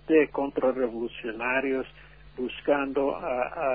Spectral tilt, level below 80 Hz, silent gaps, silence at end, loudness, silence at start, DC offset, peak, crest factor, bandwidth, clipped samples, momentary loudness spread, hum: -9 dB/octave; -56 dBFS; none; 0 s; -28 LUFS; 0.1 s; 0.1%; -10 dBFS; 18 dB; 4.9 kHz; under 0.1%; 10 LU; none